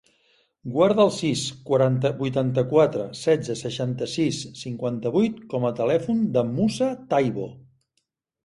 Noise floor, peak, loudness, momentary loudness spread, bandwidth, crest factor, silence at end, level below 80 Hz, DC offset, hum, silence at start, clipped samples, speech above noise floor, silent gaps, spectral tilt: -75 dBFS; -6 dBFS; -23 LUFS; 9 LU; 11.5 kHz; 18 dB; 0.85 s; -60 dBFS; under 0.1%; none; 0.65 s; under 0.1%; 53 dB; none; -6 dB/octave